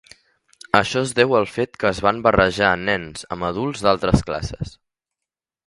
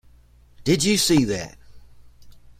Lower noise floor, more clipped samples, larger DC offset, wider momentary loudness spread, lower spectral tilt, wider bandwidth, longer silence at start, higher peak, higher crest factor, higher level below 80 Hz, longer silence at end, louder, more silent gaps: first, -87 dBFS vs -52 dBFS; neither; neither; about the same, 11 LU vs 12 LU; about the same, -5 dB/octave vs -4 dB/octave; second, 11.5 kHz vs 16.5 kHz; first, 0.75 s vs 0.6 s; first, 0 dBFS vs -6 dBFS; about the same, 20 dB vs 18 dB; first, -40 dBFS vs -46 dBFS; first, 1 s vs 0.1 s; about the same, -20 LUFS vs -20 LUFS; neither